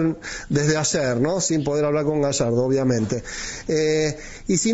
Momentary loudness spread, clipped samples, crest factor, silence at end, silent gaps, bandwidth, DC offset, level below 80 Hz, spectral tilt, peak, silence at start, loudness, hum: 7 LU; under 0.1%; 14 dB; 0 s; none; 8.2 kHz; 0.2%; -46 dBFS; -4.5 dB/octave; -6 dBFS; 0 s; -22 LUFS; none